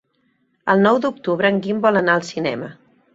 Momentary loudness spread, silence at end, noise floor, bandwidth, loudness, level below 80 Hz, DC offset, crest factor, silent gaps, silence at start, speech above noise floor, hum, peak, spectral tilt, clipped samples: 12 LU; 0.4 s; -65 dBFS; 8 kHz; -18 LUFS; -62 dBFS; under 0.1%; 18 dB; none; 0.65 s; 47 dB; none; -2 dBFS; -6 dB/octave; under 0.1%